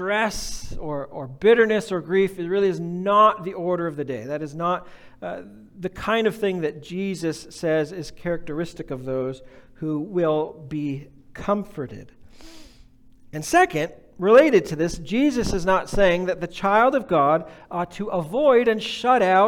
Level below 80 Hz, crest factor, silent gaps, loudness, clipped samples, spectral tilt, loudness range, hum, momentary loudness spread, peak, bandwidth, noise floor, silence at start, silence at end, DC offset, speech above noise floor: -44 dBFS; 18 dB; none; -22 LUFS; under 0.1%; -5.5 dB/octave; 8 LU; none; 16 LU; -4 dBFS; 17.5 kHz; -49 dBFS; 0 s; 0 s; under 0.1%; 28 dB